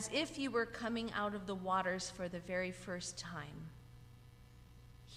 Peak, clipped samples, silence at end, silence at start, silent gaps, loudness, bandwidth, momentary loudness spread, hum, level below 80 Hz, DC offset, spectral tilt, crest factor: -22 dBFS; under 0.1%; 0 s; 0 s; none; -40 LUFS; 15.5 kHz; 23 LU; none; -64 dBFS; under 0.1%; -4 dB/octave; 20 dB